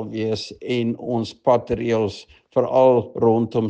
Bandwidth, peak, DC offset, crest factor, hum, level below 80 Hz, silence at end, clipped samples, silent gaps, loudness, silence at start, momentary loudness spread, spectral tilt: 8.8 kHz; -4 dBFS; under 0.1%; 16 dB; none; -52 dBFS; 0 s; under 0.1%; none; -21 LUFS; 0 s; 9 LU; -7 dB/octave